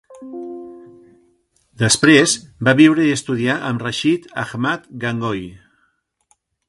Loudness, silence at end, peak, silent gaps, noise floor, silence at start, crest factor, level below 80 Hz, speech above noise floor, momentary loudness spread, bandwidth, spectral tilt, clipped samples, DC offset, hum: -16 LUFS; 1.1 s; 0 dBFS; none; -65 dBFS; 0.1 s; 18 dB; -54 dBFS; 49 dB; 21 LU; 11.5 kHz; -4 dB/octave; under 0.1%; under 0.1%; none